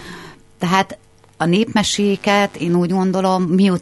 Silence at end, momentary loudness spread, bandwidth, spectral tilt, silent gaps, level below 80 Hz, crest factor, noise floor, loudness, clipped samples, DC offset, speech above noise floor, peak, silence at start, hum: 0 s; 9 LU; 12 kHz; -5.5 dB/octave; none; -50 dBFS; 18 dB; -38 dBFS; -17 LUFS; under 0.1%; under 0.1%; 22 dB; 0 dBFS; 0 s; none